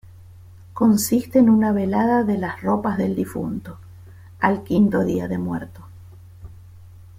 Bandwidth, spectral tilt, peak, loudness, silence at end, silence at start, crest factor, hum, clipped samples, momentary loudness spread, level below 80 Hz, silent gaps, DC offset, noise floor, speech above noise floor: 16.5 kHz; -6.5 dB/octave; -2 dBFS; -20 LUFS; 0.15 s; 0.1 s; 18 dB; none; under 0.1%; 14 LU; -50 dBFS; none; under 0.1%; -43 dBFS; 24 dB